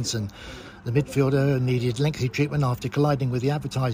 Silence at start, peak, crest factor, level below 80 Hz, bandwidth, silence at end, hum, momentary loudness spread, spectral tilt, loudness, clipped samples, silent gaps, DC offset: 0 s; -8 dBFS; 16 dB; -48 dBFS; 16 kHz; 0 s; none; 11 LU; -6.5 dB/octave; -24 LUFS; under 0.1%; none; under 0.1%